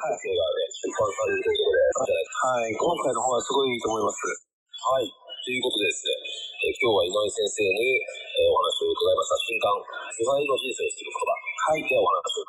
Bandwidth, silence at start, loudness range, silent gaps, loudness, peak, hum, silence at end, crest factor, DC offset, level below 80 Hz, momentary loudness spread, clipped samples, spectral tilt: 14 kHz; 0 s; 3 LU; 4.53-4.66 s; -25 LUFS; -12 dBFS; none; 0.05 s; 12 dB; under 0.1%; -62 dBFS; 7 LU; under 0.1%; -2 dB/octave